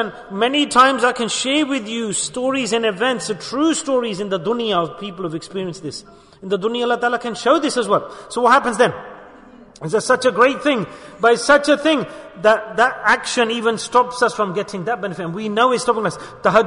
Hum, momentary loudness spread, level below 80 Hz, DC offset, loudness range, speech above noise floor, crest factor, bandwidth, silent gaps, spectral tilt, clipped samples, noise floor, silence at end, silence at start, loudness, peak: none; 13 LU; -56 dBFS; under 0.1%; 5 LU; 25 dB; 16 dB; 11 kHz; none; -3.5 dB/octave; under 0.1%; -43 dBFS; 0 s; 0 s; -18 LUFS; -2 dBFS